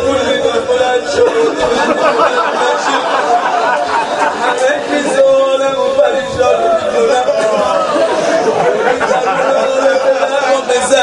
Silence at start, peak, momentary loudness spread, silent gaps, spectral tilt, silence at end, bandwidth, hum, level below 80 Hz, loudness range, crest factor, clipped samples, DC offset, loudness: 0 s; 0 dBFS; 2 LU; none; -3 dB/octave; 0 s; 11.5 kHz; none; -46 dBFS; 1 LU; 12 dB; under 0.1%; under 0.1%; -12 LUFS